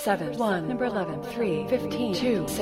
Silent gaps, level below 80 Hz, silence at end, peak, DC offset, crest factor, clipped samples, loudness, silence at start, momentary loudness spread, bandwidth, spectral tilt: none; -54 dBFS; 0 s; -10 dBFS; under 0.1%; 16 dB; under 0.1%; -27 LUFS; 0 s; 3 LU; 16 kHz; -5.5 dB/octave